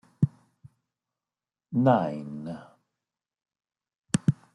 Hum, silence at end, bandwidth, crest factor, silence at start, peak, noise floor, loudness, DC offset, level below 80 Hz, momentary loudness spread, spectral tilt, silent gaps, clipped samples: none; 0.2 s; 11.5 kHz; 24 dB; 0.2 s; -8 dBFS; under -90 dBFS; -27 LUFS; under 0.1%; -64 dBFS; 16 LU; -7 dB/octave; 3.98-4.03 s; under 0.1%